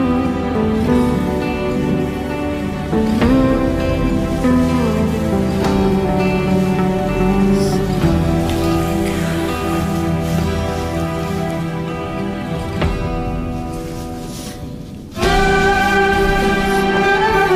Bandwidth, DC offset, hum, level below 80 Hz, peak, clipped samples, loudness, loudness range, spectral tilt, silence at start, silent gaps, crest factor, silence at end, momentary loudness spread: 16 kHz; under 0.1%; none; -28 dBFS; -4 dBFS; under 0.1%; -17 LUFS; 6 LU; -6.5 dB/octave; 0 s; none; 12 dB; 0 s; 9 LU